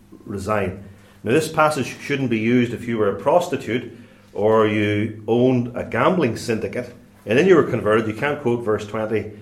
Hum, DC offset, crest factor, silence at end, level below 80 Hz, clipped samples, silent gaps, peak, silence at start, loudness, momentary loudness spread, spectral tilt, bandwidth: none; under 0.1%; 18 dB; 0 s; -56 dBFS; under 0.1%; none; -2 dBFS; 0.25 s; -20 LUFS; 12 LU; -6.5 dB/octave; 15.5 kHz